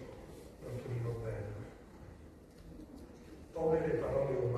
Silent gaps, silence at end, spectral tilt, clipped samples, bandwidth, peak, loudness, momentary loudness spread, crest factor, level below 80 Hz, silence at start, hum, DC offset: none; 0 s; -8.5 dB/octave; under 0.1%; 13 kHz; -20 dBFS; -37 LUFS; 21 LU; 20 dB; -56 dBFS; 0 s; none; under 0.1%